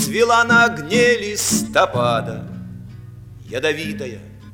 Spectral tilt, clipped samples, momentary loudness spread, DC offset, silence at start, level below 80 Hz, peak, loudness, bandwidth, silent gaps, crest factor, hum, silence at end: -3.5 dB/octave; under 0.1%; 22 LU; under 0.1%; 0 s; -48 dBFS; -2 dBFS; -17 LUFS; 17.5 kHz; none; 18 dB; none; 0 s